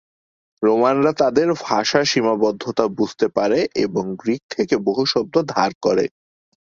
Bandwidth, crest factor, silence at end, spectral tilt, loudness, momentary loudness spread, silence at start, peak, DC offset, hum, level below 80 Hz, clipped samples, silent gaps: 7.6 kHz; 18 dB; 0.6 s; -4.5 dB/octave; -19 LUFS; 6 LU; 0.6 s; 0 dBFS; under 0.1%; none; -60 dBFS; under 0.1%; 4.43-4.49 s, 5.75-5.81 s